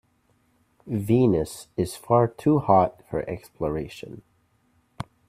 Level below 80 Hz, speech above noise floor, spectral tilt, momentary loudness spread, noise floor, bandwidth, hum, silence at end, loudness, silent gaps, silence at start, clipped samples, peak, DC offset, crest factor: -52 dBFS; 42 dB; -7.5 dB/octave; 18 LU; -66 dBFS; 15 kHz; none; 0.25 s; -24 LUFS; none; 0.85 s; under 0.1%; -4 dBFS; under 0.1%; 22 dB